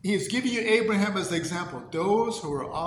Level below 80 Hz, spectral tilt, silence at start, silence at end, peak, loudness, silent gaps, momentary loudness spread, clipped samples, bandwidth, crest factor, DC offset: -60 dBFS; -4.5 dB/octave; 0.05 s; 0 s; -10 dBFS; -26 LUFS; none; 9 LU; under 0.1%; 17.5 kHz; 18 dB; under 0.1%